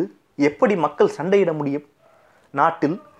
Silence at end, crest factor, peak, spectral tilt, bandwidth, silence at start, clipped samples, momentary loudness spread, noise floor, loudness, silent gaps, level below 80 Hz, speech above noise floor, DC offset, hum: 0.2 s; 18 dB; -4 dBFS; -7 dB/octave; 9.8 kHz; 0 s; under 0.1%; 10 LU; -55 dBFS; -21 LUFS; none; -68 dBFS; 36 dB; under 0.1%; none